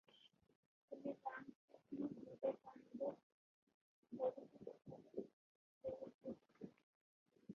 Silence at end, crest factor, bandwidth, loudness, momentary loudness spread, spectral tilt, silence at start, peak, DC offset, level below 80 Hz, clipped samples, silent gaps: 0 s; 22 dB; 6.8 kHz; -51 LUFS; 14 LU; -6 dB/octave; 0.15 s; -32 dBFS; under 0.1%; -88 dBFS; under 0.1%; 0.55-0.88 s, 1.55-1.68 s, 3.23-3.67 s, 3.74-4.03 s, 5.33-5.81 s, 6.14-6.19 s, 6.83-7.26 s